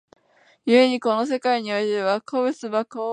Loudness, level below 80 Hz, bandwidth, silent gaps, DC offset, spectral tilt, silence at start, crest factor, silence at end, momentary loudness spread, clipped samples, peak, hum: -22 LUFS; -78 dBFS; 10 kHz; none; under 0.1%; -4.5 dB/octave; 0.65 s; 18 dB; 0 s; 9 LU; under 0.1%; -4 dBFS; none